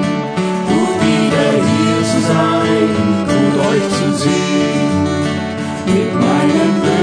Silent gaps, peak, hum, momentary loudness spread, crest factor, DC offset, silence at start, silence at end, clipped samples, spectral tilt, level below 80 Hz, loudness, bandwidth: none; 0 dBFS; none; 5 LU; 12 dB; under 0.1%; 0 s; 0 s; under 0.1%; -5.5 dB/octave; -48 dBFS; -14 LUFS; 10 kHz